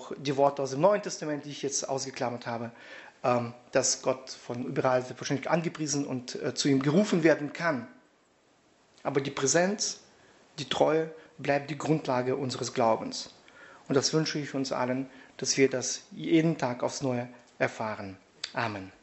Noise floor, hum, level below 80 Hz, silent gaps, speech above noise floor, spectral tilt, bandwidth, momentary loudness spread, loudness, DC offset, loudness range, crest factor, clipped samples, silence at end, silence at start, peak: -65 dBFS; none; -72 dBFS; none; 36 dB; -4 dB/octave; 8.2 kHz; 12 LU; -29 LUFS; under 0.1%; 3 LU; 20 dB; under 0.1%; 0.1 s; 0 s; -8 dBFS